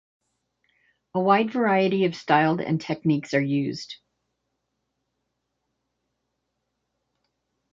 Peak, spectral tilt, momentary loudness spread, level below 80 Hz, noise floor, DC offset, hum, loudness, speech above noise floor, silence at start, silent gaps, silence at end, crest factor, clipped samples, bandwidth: -4 dBFS; -7 dB/octave; 11 LU; -70 dBFS; -79 dBFS; under 0.1%; none; -23 LUFS; 56 dB; 1.15 s; none; 3.8 s; 22 dB; under 0.1%; 7.6 kHz